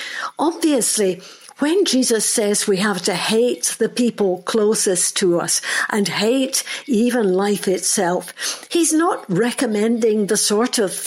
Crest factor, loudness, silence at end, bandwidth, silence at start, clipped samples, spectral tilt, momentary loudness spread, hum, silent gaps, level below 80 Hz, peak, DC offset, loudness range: 14 dB; -18 LUFS; 0 s; 16.5 kHz; 0 s; under 0.1%; -3 dB/octave; 5 LU; none; none; -70 dBFS; -4 dBFS; under 0.1%; 1 LU